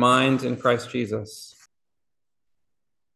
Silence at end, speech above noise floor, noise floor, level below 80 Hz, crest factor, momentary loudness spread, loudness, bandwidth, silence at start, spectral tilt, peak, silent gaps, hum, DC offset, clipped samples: 1.65 s; 66 dB; -88 dBFS; -64 dBFS; 20 dB; 18 LU; -23 LUFS; 12.5 kHz; 0 s; -5 dB/octave; -6 dBFS; none; none; under 0.1%; under 0.1%